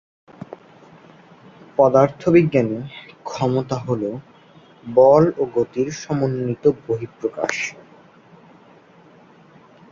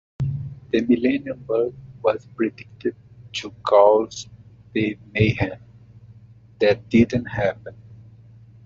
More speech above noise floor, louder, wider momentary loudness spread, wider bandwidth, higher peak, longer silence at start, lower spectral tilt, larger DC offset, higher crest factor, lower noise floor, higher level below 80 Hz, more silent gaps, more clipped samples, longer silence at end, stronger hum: first, 31 dB vs 27 dB; first, -19 LUFS vs -22 LUFS; first, 21 LU vs 14 LU; about the same, 7.6 kHz vs 7.8 kHz; about the same, -2 dBFS vs -4 dBFS; first, 1.8 s vs 0.2 s; first, -7 dB/octave vs -5.5 dB/octave; neither; about the same, 20 dB vs 20 dB; about the same, -49 dBFS vs -48 dBFS; second, -56 dBFS vs -50 dBFS; neither; neither; first, 2.2 s vs 0.7 s; neither